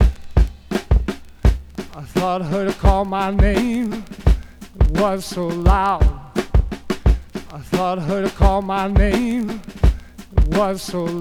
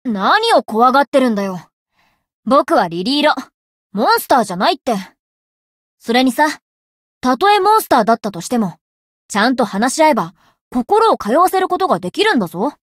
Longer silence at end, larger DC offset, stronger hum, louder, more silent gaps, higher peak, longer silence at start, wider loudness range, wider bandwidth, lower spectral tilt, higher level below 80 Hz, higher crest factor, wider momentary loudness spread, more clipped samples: second, 0 s vs 0.2 s; neither; neither; second, -20 LUFS vs -15 LUFS; second, none vs 1.07-1.12 s, 1.73-1.86 s, 2.34-2.43 s, 3.54-3.90 s, 5.19-5.97 s, 6.62-7.21 s, 8.81-9.29 s, 10.61-10.71 s; about the same, 0 dBFS vs -2 dBFS; about the same, 0 s vs 0.05 s; about the same, 1 LU vs 3 LU; second, 13.5 kHz vs 16.5 kHz; first, -7 dB/octave vs -4 dB/octave; first, -20 dBFS vs -58 dBFS; about the same, 16 dB vs 14 dB; about the same, 9 LU vs 11 LU; neither